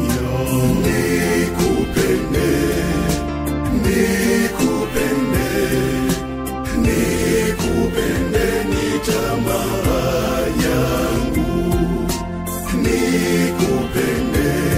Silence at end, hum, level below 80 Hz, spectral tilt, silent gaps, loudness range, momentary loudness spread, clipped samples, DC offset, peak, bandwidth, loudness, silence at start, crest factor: 0 s; none; -28 dBFS; -5.5 dB/octave; none; 1 LU; 4 LU; under 0.1%; under 0.1%; -4 dBFS; 16 kHz; -18 LUFS; 0 s; 14 dB